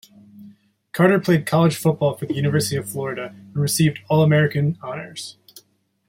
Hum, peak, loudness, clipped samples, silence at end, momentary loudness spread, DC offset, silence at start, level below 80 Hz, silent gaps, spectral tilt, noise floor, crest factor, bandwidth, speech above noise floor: none; -2 dBFS; -20 LUFS; under 0.1%; 0.8 s; 14 LU; under 0.1%; 0.35 s; -60 dBFS; none; -6 dB/octave; -58 dBFS; 18 dB; 16.5 kHz; 39 dB